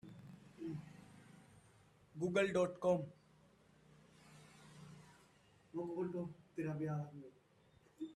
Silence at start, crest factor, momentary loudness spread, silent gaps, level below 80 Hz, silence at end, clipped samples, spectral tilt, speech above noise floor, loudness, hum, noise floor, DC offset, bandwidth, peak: 0.05 s; 22 dB; 25 LU; none; -78 dBFS; 0 s; under 0.1%; -6.5 dB/octave; 31 dB; -42 LUFS; none; -70 dBFS; under 0.1%; 12.5 kHz; -22 dBFS